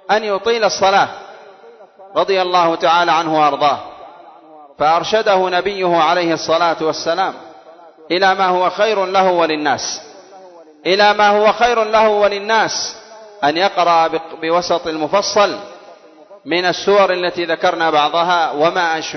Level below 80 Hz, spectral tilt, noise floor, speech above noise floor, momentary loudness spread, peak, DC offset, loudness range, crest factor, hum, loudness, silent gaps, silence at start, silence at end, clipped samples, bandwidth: -56 dBFS; -3 dB/octave; -42 dBFS; 27 dB; 8 LU; 0 dBFS; under 0.1%; 2 LU; 14 dB; none; -15 LUFS; none; 0.1 s; 0 s; under 0.1%; 6.4 kHz